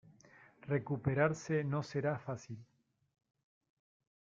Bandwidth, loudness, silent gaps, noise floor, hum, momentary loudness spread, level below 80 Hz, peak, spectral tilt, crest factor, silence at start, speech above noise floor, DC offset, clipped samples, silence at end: 7.6 kHz; -37 LUFS; none; -63 dBFS; none; 17 LU; -72 dBFS; -16 dBFS; -7 dB/octave; 22 dB; 0.65 s; 27 dB; under 0.1%; under 0.1%; 1.6 s